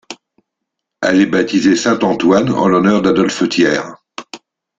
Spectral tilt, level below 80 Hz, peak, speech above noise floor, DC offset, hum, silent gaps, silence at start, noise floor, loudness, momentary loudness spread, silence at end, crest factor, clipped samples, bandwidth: -5 dB/octave; -52 dBFS; 0 dBFS; 65 dB; under 0.1%; none; none; 0.1 s; -77 dBFS; -13 LUFS; 19 LU; 0.4 s; 14 dB; under 0.1%; 7.8 kHz